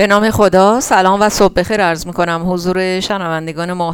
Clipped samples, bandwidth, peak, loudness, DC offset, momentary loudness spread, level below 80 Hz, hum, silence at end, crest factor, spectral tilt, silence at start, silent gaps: under 0.1%; 19 kHz; 0 dBFS; -13 LUFS; under 0.1%; 8 LU; -36 dBFS; none; 0 s; 12 dB; -4.5 dB/octave; 0 s; none